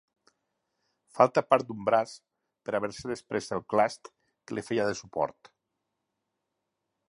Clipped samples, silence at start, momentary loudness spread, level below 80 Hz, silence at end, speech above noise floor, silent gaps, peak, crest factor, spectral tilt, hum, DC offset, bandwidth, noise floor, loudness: under 0.1%; 1.15 s; 14 LU; -68 dBFS; 1.8 s; 55 dB; none; -6 dBFS; 26 dB; -5 dB/octave; none; under 0.1%; 11 kHz; -83 dBFS; -29 LUFS